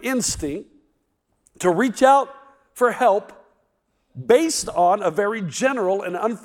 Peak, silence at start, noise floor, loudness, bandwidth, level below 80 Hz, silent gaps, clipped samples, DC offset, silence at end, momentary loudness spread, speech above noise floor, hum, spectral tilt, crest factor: -2 dBFS; 0 s; -70 dBFS; -20 LUFS; 17.5 kHz; -52 dBFS; none; under 0.1%; under 0.1%; 0.05 s; 10 LU; 50 dB; none; -4 dB/octave; 20 dB